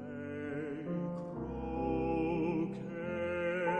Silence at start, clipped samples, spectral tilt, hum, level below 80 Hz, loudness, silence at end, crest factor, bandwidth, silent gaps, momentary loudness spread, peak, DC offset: 0 s; under 0.1%; -8.5 dB/octave; none; -54 dBFS; -37 LUFS; 0 s; 14 dB; 8.4 kHz; none; 7 LU; -22 dBFS; under 0.1%